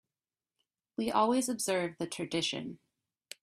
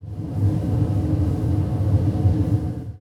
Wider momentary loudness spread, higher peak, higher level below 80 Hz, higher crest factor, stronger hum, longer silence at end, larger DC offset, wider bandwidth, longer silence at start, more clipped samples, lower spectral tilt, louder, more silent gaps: first, 16 LU vs 4 LU; second, -14 dBFS vs -8 dBFS; second, -74 dBFS vs -36 dBFS; first, 20 dB vs 12 dB; neither; first, 0.65 s vs 0 s; neither; first, 15 kHz vs 6 kHz; first, 1 s vs 0 s; neither; second, -3.5 dB/octave vs -10 dB/octave; second, -32 LUFS vs -22 LUFS; neither